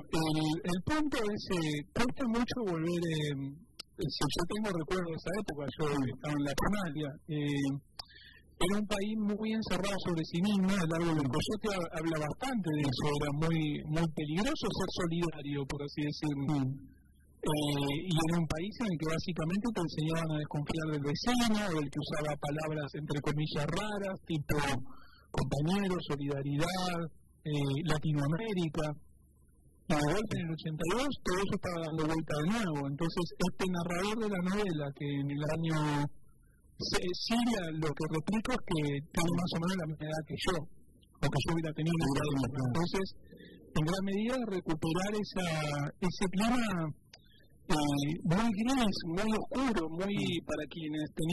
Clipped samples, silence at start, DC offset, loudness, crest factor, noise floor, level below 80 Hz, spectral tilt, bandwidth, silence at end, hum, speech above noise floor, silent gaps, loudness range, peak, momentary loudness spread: under 0.1%; 0 s; under 0.1%; -34 LUFS; 18 dB; -63 dBFS; -50 dBFS; -5.5 dB/octave; 12 kHz; 0 s; none; 30 dB; none; 2 LU; -16 dBFS; 7 LU